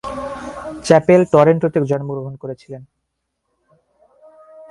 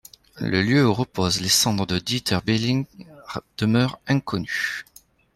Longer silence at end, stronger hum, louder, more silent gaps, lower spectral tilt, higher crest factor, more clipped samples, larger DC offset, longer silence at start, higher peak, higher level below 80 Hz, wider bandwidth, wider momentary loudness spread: second, 0.05 s vs 0.55 s; neither; first, -15 LUFS vs -22 LUFS; neither; first, -7 dB/octave vs -4 dB/octave; about the same, 18 dB vs 16 dB; neither; neither; second, 0.05 s vs 0.35 s; first, 0 dBFS vs -6 dBFS; about the same, -52 dBFS vs -52 dBFS; second, 11.5 kHz vs 14.5 kHz; first, 20 LU vs 14 LU